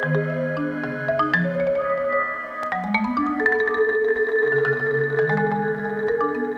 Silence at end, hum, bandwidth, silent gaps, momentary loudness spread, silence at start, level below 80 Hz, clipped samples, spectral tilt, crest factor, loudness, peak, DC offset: 0 s; none; 6.6 kHz; none; 6 LU; 0 s; -56 dBFS; under 0.1%; -8 dB/octave; 16 dB; -22 LUFS; -6 dBFS; under 0.1%